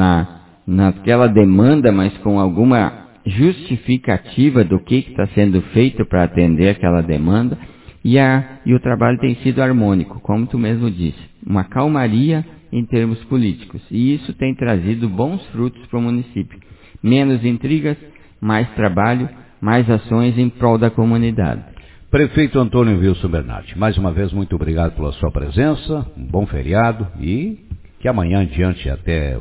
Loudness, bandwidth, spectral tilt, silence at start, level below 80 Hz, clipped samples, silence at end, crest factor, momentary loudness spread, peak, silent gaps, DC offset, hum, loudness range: -16 LUFS; 4 kHz; -12 dB/octave; 0 s; -30 dBFS; under 0.1%; 0 s; 16 dB; 10 LU; 0 dBFS; none; under 0.1%; none; 5 LU